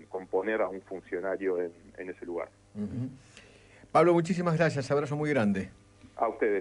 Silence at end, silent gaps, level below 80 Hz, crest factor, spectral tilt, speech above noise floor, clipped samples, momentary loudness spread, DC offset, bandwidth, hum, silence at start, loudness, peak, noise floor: 0 s; none; -64 dBFS; 20 dB; -7 dB/octave; 26 dB; under 0.1%; 17 LU; under 0.1%; 11 kHz; none; 0 s; -30 LUFS; -10 dBFS; -55 dBFS